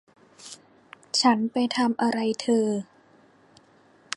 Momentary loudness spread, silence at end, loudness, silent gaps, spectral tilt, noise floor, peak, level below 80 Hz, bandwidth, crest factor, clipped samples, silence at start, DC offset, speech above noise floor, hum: 23 LU; 1.35 s; -24 LUFS; none; -3.5 dB/octave; -58 dBFS; -6 dBFS; -76 dBFS; 11.5 kHz; 22 dB; under 0.1%; 0.4 s; under 0.1%; 34 dB; none